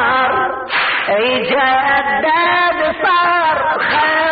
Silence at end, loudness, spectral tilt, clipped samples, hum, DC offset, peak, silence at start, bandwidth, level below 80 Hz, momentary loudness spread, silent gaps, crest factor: 0 s; -13 LUFS; 0 dB/octave; under 0.1%; none; under 0.1%; -4 dBFS; 0 s; 5 kHz; -50 dBFS; 3 LU; none; 10 dB